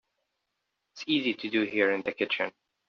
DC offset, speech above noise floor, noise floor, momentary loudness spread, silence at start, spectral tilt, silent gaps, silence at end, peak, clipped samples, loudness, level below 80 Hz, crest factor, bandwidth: under 0.1%; 53 dB; -82 dBFS; 6 LU; 0.95 s; -1.5 dB/octave; none; 0.4 s; -10 dBFS; under 0.1%; -28 LUFS; -76 dBFS; 20 dB; 7 kHz